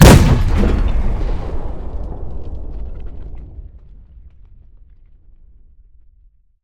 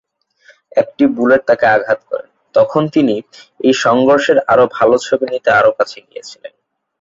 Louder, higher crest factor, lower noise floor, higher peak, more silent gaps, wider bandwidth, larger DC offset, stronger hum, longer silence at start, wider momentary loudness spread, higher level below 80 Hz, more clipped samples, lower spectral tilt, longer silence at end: second, -18 LUFS vs -13 LUFS; about the same, 16 dB vs 14 dB; about the same, -51 dBFS vs -50 dBFS; about the same, 0 dBFS vs 0 dBFS; neither; first, 18 kHz vs 7.8 kHz; neither; neither; second, 0 s vs 0.75 s; first, 22 LU vs 13 LU; first, -20 dBFS vs -54 dBFS; first, 0.8% vs under 0.1%; about the same, -6 dB/octave vs -5 dB/octave; first, 2.35 s vs 0.55 s